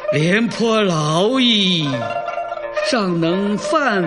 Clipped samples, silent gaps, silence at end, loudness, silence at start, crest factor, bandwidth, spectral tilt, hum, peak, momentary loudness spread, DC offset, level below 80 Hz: under 0.1%; none; 0 s; -17 LUFS; 0 s; 14 dB; 11 kHz; -5 dB/octave; none; -2 dBFS; 10 LU; under 0.1%; -54 dBFS